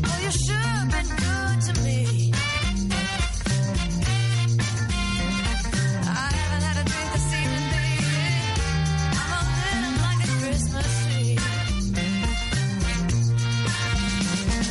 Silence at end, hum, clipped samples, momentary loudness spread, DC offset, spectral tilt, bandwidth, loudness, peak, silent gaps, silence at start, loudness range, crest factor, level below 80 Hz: 0 s; none; under 0.1%; 2 LU; under 0.1%; -4.5 dB/octave; 11.5 kHz; -24 LUFS; -10 dBFS; none; 0 s; 1 LU; 14 dB; -32 dBFS